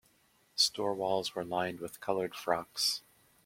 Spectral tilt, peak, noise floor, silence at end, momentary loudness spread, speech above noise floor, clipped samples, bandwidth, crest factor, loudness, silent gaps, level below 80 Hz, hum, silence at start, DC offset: -2.5 dB/octave; -14 dBFS; -69 dBFS; 0.45 s; 10 LU; 35 dB; under 0.1%; 16.5 kHz; 20 dB; -33 LUFS; none; -72 dBFS; none; 0.55 s; under 0.1%